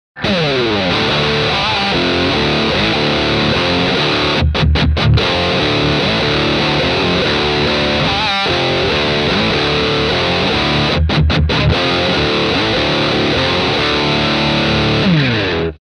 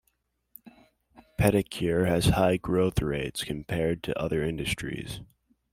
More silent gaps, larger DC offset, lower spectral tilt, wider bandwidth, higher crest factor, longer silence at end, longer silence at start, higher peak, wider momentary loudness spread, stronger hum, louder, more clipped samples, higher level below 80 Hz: neither; neither; about the same, -5.5 dB/octave vs -6 dB/octave; second, 11 kHz vs 16 kHz; second, 14 dB vs 20 dB; second, 0.25 s vs 0.5 s; second, 0.15 s vs 0.65 s; first, 0 dBFS vs -8 dBFS; second, 1 LU vs 11 LU; neither; first, -13 LUFS vs -27 LUFS; neither; first, -26 dBFS vs -44 dBFS